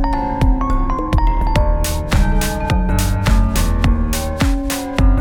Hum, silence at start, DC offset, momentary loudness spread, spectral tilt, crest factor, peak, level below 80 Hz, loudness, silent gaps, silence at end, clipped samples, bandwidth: none; 0 s; under 0.1%; 3 LU; -5.5 dB/octave; 12 dB; -2 dBFS; -16 dBFS; -18 LUFS; none; 0 s; under 0.1%; 18.5 kHz